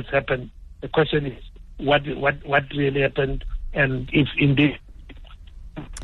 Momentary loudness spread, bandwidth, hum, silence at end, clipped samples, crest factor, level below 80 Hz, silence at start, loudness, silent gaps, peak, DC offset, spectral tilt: 19 LU; 9.8 kHz; none; 0 s; under 0.1%; 18 dB; -36 dBFS; 0 s; -22 LUFS; none; -6 dBFS; under 0.1%; -7 dB/octave